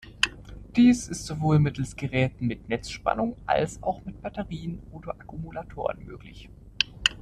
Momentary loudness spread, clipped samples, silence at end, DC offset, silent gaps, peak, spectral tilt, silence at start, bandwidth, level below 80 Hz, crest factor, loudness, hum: 18 LU; under 0.1%; 0 s; under 0.1%; none; -2 dBFS; -5 dB/octave; 0.05 s; 12.5 kHz; -48 dBFS; 26 dB; -27 LUFS; none